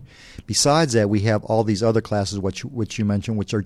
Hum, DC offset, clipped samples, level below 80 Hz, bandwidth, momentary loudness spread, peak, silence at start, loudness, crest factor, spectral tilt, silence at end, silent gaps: none; under 0.1%; under 0.1%; -48 dBFS; 14 kHz; 10 LU; -4 dBFS; 0 s; -21 LUFS; 18 dB; -5 dB/octave; 0 s; none